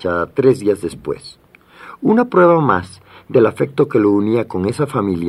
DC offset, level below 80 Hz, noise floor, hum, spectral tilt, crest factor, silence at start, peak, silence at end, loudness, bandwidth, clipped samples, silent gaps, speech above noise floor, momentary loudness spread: under 0.1%; -54 dBFS; -41 dBFS; none; -7.5 dB/octave; 14 dB; 0.05 s; -2 dBFS; 0 s; -16 LUFS; 12.5 kHz; under 0.1%; none; 26 dB; 12 LU